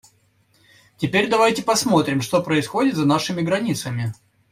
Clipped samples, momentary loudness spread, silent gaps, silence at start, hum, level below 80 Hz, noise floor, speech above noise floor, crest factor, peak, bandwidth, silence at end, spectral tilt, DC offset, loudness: under 0.1%; 9 LU; none; 1 s; none; -58 dBFS; -61 dBFS; 41 dB; 16 dB; -4 dBFS; 16 kHz; 0.4 s; -5 dB/octave; under 0.1%; -20 LUFS